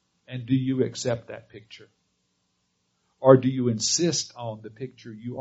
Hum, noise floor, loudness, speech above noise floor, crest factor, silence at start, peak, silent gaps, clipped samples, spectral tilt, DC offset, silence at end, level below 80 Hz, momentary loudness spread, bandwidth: none; -73 dBFS; -23 LUFS; 49 dB; 24 dB; 0.3 s; -2 dBFS; none; under 0.1%; -6 dB/octave; under 0.1%; 0 s; -66 dBFS; 21 LU; 8 kHz